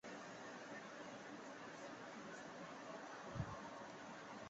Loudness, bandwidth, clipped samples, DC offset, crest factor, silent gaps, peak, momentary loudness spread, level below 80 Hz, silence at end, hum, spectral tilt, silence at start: -53 LUFS; 8 kHz; under 0.1%; under 0.1%; 20 dB; none; -34 dBFS; 4 LU; -72 dBFS; 0 s; none; -4 dB/octave; 0.05 s